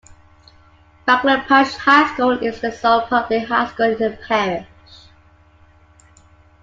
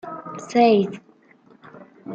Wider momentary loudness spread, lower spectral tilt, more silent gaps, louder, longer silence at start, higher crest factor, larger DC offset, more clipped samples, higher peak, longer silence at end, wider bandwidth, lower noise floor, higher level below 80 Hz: second, 9 LU vs 24 LU; second, -4.5 dB/octave vs -6 dB/octave; neither; about the same, -17 LUFS vs -19 LUFS; first, 1.05 s vs 0.05 s; about the same, 18 dB vs 20 dB; neither; neither; about the same, -2 dBFS vs -4 dBFS; first, 2 s vs 0 s; about the same, 7.8 kHz vs 8.2 kHz; about the same, -51 dBFS vs -54 dBFS; first, -52 dBFS vs -70 dBFS